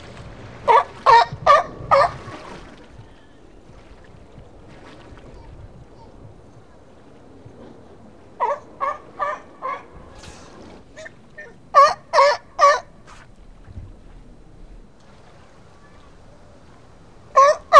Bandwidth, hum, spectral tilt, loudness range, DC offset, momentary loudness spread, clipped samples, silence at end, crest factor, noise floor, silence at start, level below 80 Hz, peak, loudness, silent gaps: 10.5 kHz; none; -3 dB/octave; 13 LU; 0.3%; 27 LU; under 0.1%; 0 s; 22 dB; -48 dBFS; 0.2 s; -48 dBFS; 0 dBFS; -17 LUFS; none